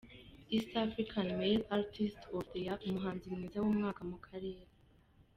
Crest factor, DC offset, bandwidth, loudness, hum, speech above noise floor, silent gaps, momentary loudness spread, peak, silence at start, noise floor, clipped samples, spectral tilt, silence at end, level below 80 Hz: 18 dB; under 0.1%; 9.8 kHz; -38 LUFS; none; 29 dB; none; 12 LU; -20 dBFS; 0.05 s; -66 dBFS; under 0.1%; -7 dB/octave; 0.75 s; -62 dBFS